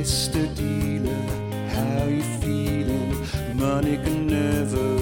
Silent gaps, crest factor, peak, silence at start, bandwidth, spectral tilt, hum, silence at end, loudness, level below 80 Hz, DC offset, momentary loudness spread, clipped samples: none; 16 dB; -8 dBFS; 0 s; 18 kHz; -5.5 dB/octave; none; 0 s; -24 LUFS; -34 dBFS; under 0.1%; 5 LU; under 0.1%